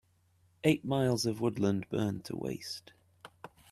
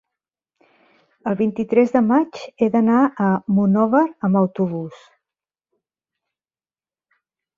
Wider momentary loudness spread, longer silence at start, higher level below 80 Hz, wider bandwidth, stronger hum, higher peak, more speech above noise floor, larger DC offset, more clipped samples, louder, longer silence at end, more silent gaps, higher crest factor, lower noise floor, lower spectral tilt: first, 17 LU vs 10 LU; second, 0.65 s vs 1.25 s; about the same, -66 dBFS vs -64 dBFS; first, 15 kHz vs 7.2 kHz; neither; second, -12 dBFS vs -4 dBFS; second, 37 dB vs over 72 dB; neither; neither; second, -33 LUFS vs -18 LUFS; second, 0.25 s vs 2.65 s; neither; about the same, 22 dB vs 18 dB; second, -69 dBFS vs under -90 dBFS; second, -6 dB/octave vs -9 dB/octave